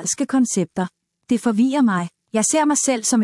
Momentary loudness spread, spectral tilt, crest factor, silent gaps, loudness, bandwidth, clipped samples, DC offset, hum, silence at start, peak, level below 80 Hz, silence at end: 8 LU; -4 dB/octave; 14 dB; none; -19 LUFS; 12 kHz; under 0.1%; under 0.1%; none; 0 s; -6 dBFS; -66 dBFS; 0 s